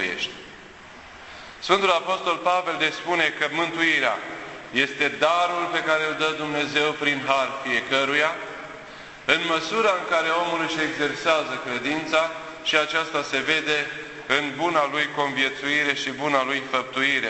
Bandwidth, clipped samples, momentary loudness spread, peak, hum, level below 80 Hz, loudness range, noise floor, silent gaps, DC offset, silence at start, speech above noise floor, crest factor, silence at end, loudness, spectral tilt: 8.4 kHz; under 0.1%; 14 LU; -2 dBFS; none; -62 dBFS; 1 LU; -44 dBFS; none; under 0.1%; 0 s; 21 dB; 22 dB; 0 s; -23 LUFS; -3 dB/octave